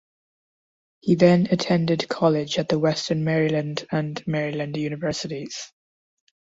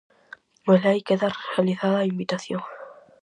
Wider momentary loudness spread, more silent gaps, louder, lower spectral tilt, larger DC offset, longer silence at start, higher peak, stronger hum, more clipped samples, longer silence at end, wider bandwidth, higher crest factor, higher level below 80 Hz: about the same, 13 LU vs 13 LU; neither; about the same, -23 LUFS vs -23 LUFS; about the same, -6 dB/octave vs -7 dB/octave; neither; first, 1.05 s vs 0.65 s; about the same, -4 dBFS vs -6 dBFS; neither; neither; first, 0.8 s vs 0.3 s; second, 7.8 kHz vs 9.8 kHz; about the same, 20 dB vs 18 dB; first, -60 dBFS vs -72 dBFS